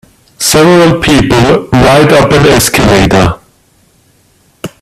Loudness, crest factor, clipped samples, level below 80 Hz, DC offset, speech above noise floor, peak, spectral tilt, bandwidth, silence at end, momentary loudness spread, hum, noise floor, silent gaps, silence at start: -6 LUFS; 8 dB; 0.3%; -26 dBFS; under 0.1%; 43 dB; 0 dBFS; -4.5 dB/octave; 16.5 kHz; 0.15 s; 8 LU; none; -48 dBFS; none; 0.4 s